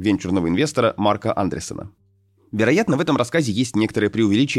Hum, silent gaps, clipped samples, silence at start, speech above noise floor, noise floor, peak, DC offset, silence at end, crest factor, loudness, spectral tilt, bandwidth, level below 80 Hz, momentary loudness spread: none; none; under 0.1%; 0 s; 39 dB; -59 dBFS; -4 dBFS; under 0.1%; 0 s; 16 dB; -20 LUFS; -5.5 dB/octave; 13 kHz; -52 dBFS; 8 LU